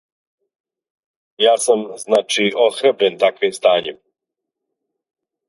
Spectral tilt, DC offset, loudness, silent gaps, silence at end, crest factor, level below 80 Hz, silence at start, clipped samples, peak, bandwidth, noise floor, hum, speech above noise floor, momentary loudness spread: -2.5 dB/octave; under 0.1%; -16 LUFS; none; 1.55 s; 18 dB; -72 dBFS; 1.4 s; under 0.1%; 0 dBFS; 11.5 kHz; -81 dBFS; none; 65 dB; 4 LU